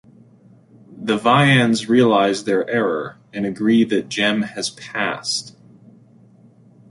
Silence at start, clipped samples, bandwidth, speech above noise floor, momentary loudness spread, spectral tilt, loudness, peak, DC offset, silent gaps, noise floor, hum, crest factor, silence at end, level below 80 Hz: 0.9 s; under 0.1%; 11.5 kHz; 32 dB; 12 LU; -5 dB/octave; -18 LUFS; -2 dBFS; under 0.1%; none; -50 dBFS; none; 18 dB; 1.4 s; -62 dBFS